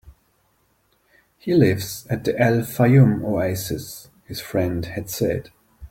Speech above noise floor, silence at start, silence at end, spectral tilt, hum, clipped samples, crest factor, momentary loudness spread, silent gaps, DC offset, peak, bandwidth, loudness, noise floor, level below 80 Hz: 44 dB; 0.05 s; 0.05 s; -6.5 dB/octave; none; under 0.1%; 18 dB; 17 LU; none; under 0.1%; -4 dBFS; 17 kHz; -21 LUFS; -64 dBFS; -50 dBFS